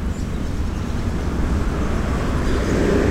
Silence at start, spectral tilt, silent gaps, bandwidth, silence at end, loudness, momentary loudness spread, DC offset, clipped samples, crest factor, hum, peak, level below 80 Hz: 0 s; -6.5 dB/octave; none; 15.5 kHz; 0 s; -22 LUFS; 7 LU; 0.6%; under 0.1%; 14 dB; none; -6 dBFS; -24 dBFS